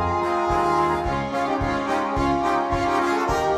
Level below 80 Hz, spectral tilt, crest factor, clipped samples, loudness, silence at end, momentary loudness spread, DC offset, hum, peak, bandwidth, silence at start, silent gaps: -38 dBFS; -6 dB/octave; 12 dB; under 0.1%; -22 LUFS; 0 s; 3 LU; under 0.1%; none; -8 dBFS; 14.5 kHz; 0 s; none